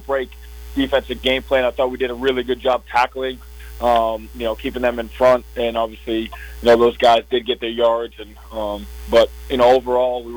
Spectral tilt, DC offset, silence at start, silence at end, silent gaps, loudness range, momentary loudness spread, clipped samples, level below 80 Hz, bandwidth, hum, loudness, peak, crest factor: -5 dB/octave; under 0.1%; 0 s; 0 s; none; 3 LU; 13 LU; under 0.1%; -38 dBFS; over 20 kHz; none; -19 LUFS; -6 dBFS; 12 dB